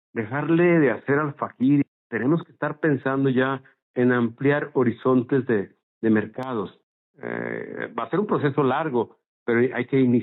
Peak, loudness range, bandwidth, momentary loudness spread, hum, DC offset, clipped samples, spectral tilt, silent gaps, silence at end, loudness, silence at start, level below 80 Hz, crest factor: -8 dBFS; 4 LU; 4.1 kHz; 11 LU; none; under 0.1%; under 0.1%; -7 dB/octave; 1.88-2.10 s, 3.82-3.94 s, 5.83-6.01 s, 6.83-7.14 s, 9.28-9.46 s; 0 s; -23 LUFS; 0.15 s; -74 dBFS; 14 dB